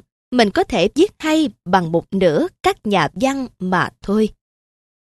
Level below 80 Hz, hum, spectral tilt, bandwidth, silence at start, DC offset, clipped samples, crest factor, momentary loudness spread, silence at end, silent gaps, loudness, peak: -46 dBFS; none; -5.5 dB/octave; 13 kHz; 0.3 s; under 0.1%; under 0.1%; 18 dB; 4 LU; 0.9 s; none; -18 LUFS; 0 dBFS